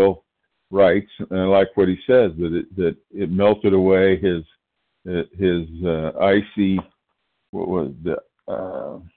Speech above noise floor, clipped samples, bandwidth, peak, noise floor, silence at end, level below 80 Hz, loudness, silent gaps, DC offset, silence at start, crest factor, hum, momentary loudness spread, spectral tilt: 55 dB; under 0.1%; 4.4 kHz; -6 dBFS; -74 dBFS; 0.1 s; -48 dBFS; -20 LUFS; 7.49-7.53 s; under 0.1%; 0 s; 14 dB; none; 13 LU; -12 dB/octave